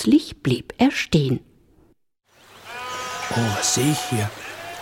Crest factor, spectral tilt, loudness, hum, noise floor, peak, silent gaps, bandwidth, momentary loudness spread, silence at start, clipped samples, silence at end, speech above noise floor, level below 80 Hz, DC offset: 18 dB; -4.5 dB/octave; -22 LUFS; none; -58 dBFS; -4 dBFS; none; 17.5 kHz; 14 LU; 0 s; under 0.1%; 0 s; 38 dB; -50 dBFS; under 0.1%